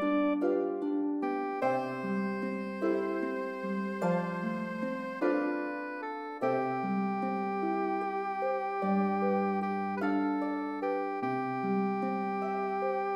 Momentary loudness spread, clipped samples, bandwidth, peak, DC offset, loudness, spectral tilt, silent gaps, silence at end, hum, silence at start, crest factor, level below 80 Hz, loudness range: 6 LU; under 0.1%; 10.5 kHz; -18 dBFS; under 0.1%; -32 LUFS; -8.5 dB/octave; none; 0 s; none; 0 s; 14 dB; -82 dBFS; 2 LU